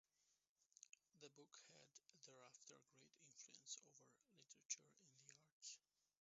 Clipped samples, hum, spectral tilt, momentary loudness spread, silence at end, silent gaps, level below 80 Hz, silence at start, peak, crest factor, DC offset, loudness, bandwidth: under 0.1%; none; -1 dB/octave; 15 LU; 0.4 s; 0.49-0.56 s, 5.52-5.60 s; under -90 dBFS; 0.2 s; -34 dBFS; 32 dB; under 0.1%; -61 LUFS; 7.6 kHz